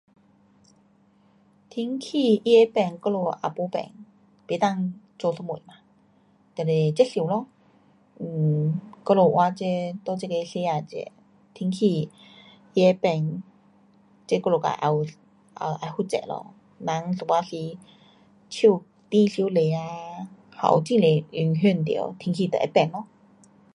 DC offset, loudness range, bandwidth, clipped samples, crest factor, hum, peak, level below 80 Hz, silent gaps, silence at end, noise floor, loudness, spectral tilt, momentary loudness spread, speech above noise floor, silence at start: under 0.1%; 5 LU; 11 kHz; under 0.1%; 20 dB; none; -4 dBFS; -70 dBFS; none; 0.7 s; -60 dBFS; -24 LUFS; -7 dB/octave; 16 LU; 37 dB; 1.75 s